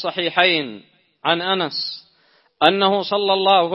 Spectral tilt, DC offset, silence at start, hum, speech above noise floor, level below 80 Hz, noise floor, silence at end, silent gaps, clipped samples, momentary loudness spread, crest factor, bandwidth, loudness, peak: -6 dB/octave; under 0.1%; 0 s; none; 41 dB; -72 dBFS; -59 dBFS; 0 s; none; under 0.1%; 11 LU; 20 dB; 6 kHz; -18 LUFS; 0 dBFS